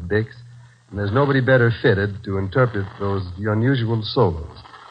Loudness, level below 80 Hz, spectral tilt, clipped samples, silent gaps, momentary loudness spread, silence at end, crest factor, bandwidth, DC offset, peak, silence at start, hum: -20 LUFS; -48 dBFS; -9 dB/octave; under 0.1%; none; 11 LU; 0.05 s; 18 dB; 5.6 kHz; under 0.1%; -2 dBFS; 0 s; none